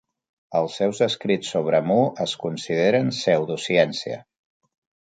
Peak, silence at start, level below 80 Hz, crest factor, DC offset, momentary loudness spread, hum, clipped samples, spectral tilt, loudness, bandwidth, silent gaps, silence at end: -4 dBFS; 0.5 s; -68 dBFS; 18 dB; under 0.1%; 8 LU; none; under 0.1%; -5 dB/octave; -22 LUFS; 9.4 kHz; none; 0.95 s